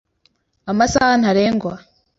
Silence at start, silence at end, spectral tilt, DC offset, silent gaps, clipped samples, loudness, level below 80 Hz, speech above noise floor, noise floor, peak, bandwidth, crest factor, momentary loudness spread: 0.65 s; 0.4 s; -4.5 dB/octave; under 0.1%; none; under 0.1%; -16 LUFS; -44 dBFS; 47 dB; -63 dBFS; -2 dBFS; 8 kHz; 16 dB; 19 LU